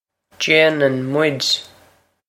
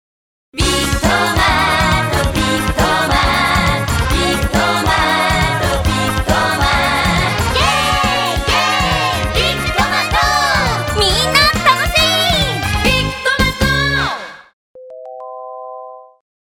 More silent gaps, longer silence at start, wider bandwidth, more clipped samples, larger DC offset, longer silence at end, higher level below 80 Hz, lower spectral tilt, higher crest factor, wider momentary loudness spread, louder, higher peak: second, none vs 14.53-14.75 s; second, 0.4 s vs 0.55 s; second, 16 kHz vs 19.5 kHz; neither; neither; first, 0.65 s vs 0.4 s; second, -66 dBFS vs -26 dBFS; about the same, -3.5 dB/octave vs -3.5 dB/octave; about the same, 18 dB vs 14 dB; about the same, 7 LU vs 7 LU; second, -16 LUFS vs -13 LUFS; about the same, 0 dBFS vs 0 dBFS